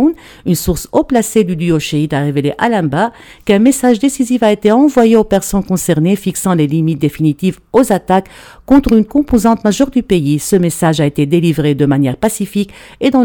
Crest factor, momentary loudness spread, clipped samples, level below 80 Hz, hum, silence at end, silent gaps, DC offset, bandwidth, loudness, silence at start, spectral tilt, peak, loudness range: 12 dB; 6 LU; under 0.1%; -34 dBFS; none; 0 s; none; under 0.1%; 19 kHz; -13 LUFS; 0 s; -6 dB/octave; 0 dBFS; 2 LU